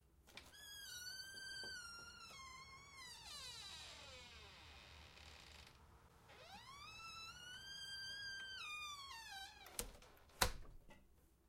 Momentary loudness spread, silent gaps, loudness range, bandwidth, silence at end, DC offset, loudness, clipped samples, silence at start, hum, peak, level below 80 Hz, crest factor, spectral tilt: 14 LU; none; 10 LU; 16 kHz; 0 s; under 0.1%; -51 LUFS; under 0.1%; 0 s; none; -16 dBFS; -64 dBFS; 38 dB; -1 dB/octave